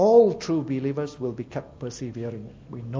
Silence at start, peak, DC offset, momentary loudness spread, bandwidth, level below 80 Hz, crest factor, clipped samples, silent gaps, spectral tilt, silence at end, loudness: 0 s; -6 dBFS; under 0.1%; 19 LU; 7.6 kHz; -56 dBFS; 18 dB; under 0.1%; none; -7 dB/octave; 0 s; -26 LUFS